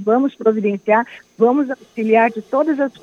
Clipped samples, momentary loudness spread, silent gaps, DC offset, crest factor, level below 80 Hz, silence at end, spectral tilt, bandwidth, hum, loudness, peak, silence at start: under 0.1%; 6 LU; none; under 0.1%; 16 dB; -72 dBFS; 0.1 s; -7.5 dB/octave; 6.8 kHz; none; -17 LUFS; -2 dBFS; 0 s